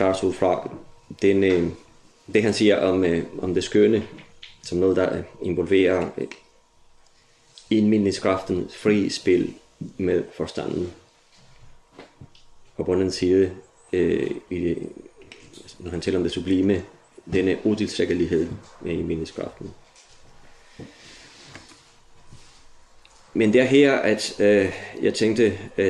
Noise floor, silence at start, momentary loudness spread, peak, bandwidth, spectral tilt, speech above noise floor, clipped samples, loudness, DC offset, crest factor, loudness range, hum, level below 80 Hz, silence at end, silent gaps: -56 dBFS; 0 s; 20 LU; -4 dBFS; 11.5 kHz; -6 dB/octave; 35 dB; under 0.1%; -22 LUFS; under 0.1%; 18 dB; 8 LU; none; -56 dBFS; 0 s; none